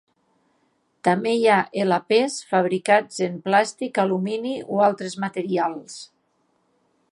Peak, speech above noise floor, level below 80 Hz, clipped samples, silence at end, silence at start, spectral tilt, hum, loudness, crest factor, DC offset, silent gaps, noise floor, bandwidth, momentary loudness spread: -4 dBFS; 46 dB; -76 dBFS; under 0.1%; 1.05 s; 1.05 s; -5 dB/octave; none; -22 LUFS; 20 dB; under 0.1%; none; -68 dBFS; 11.5 kHz; 9 LU